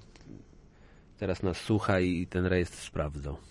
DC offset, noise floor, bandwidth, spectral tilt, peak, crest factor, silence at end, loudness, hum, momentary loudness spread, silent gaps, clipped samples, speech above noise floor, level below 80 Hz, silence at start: under 0.1%; -56 dBFS; 11.5 kHz; -6.5 dB/octave; -14 dBFS; 18 dB; 0 s; -31 LUFS; none; 18 LU; none; under 0.1%; 26 dB; -50 dBFS; 0 s